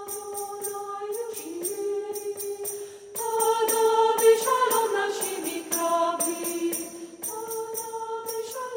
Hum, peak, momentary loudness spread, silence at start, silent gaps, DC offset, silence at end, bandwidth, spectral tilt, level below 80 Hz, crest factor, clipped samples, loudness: none; -8 dBFS; 12 LU; 0 s; none; under 0.1%; 0 s; 17 kHz; -1 dB/octave; -76 dBFS; 18 dB; under 0.1%; -26 LUFS